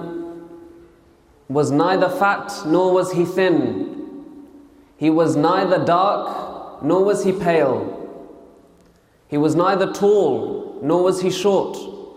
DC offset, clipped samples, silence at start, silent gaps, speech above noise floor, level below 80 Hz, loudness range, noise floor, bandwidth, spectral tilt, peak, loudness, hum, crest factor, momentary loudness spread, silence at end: under 0.1%; under 0.1%; 0 s; none; 36 dB; -60 dBFS; 2 LU; -54 dBFS; 15.5 kHz; -6 dB/octave; -2 dBFS; -19 LUFS; none; 16 dB; 16 LU; 0.05 s